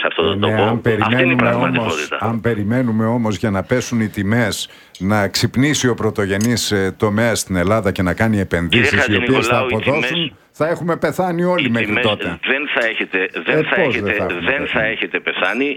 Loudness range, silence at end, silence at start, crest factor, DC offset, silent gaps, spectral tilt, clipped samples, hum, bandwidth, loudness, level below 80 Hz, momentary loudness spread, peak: 2 LU; 0 s; 0 s; 16 dB; under 0.1%; none; -5 dB/octave; under 0.1%; none; 17.5 kHz; -17 LUFS; -46 dBFS; 5 LU; 0 dBFS